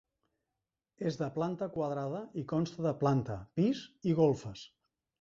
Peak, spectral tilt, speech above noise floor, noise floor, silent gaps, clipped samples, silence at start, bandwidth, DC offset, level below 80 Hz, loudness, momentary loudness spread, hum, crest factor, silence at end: -14 dBFS; -8 dB/octave; 56 dB; -89 dBFS; none; under 0.1%; 1 s; 7.6 kHz; under 0.1%; -66 dBFS; -34 LUFS; 10 LU; none; 20 dB; 0.55 s